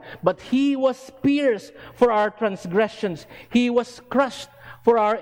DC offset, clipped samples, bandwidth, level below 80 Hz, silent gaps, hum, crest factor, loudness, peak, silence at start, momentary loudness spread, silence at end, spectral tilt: under 0.1%; under 0.1%; 16.5 kHz; -58 dBFS; none; none; 18 dB; -22 LUFS; -4 dBFS; 0.05 s; 10 LU; 0 s; -6 dB/octave